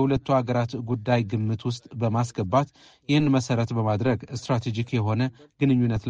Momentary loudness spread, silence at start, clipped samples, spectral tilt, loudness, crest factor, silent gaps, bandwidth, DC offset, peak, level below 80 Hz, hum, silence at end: 7 LU; 0 s; under 0.1%; -7 dB/octave; -25 LUFS; 16 dB; none; 8.6 kHz; under 0.1%; -8 dBFS; -52 dBFS; none; 0 s